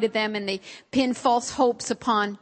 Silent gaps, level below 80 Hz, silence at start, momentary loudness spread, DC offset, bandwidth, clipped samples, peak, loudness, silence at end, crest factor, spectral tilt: none; -62 dBFS; 0 s; 7 LU; under 0.1%; 8.8 kHz; under 0.1%; -8 dBFS; -25 LUFS; 0.05 s; 16 dB; -3.5 dB/octave